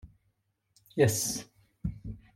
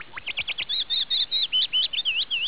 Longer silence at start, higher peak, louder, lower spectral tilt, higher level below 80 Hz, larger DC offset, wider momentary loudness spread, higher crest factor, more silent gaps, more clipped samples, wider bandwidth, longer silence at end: about the same, 0.05 s vs 0 s; about the same, -12 dBFS vs -14 dBFS; second, -31 LUFS vs -21 LUFS; first, -4.5 dB/octave vs 4 dB/octave; first, -52 dBFS vs -62 dBFS; second, under 0.1% vs 0.7%; first, 14 LU vs 8 LU; first, 22 dB vs 12 dB; neither; neither; first, 16.5 kHz vs 4 kHz; first, 0.2 s vs 0 s